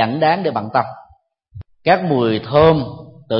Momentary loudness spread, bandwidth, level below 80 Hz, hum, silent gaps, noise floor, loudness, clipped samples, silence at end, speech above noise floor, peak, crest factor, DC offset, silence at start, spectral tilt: 14 LU; 5.8 kHz; -46 dBFS; none; none; -53 dBFS; -16 LUFS; under 0.1%; 0 s; 38 dB; 0 dBFS; 16 dB; under 0.1%; 0 s; -11.5 dB/octave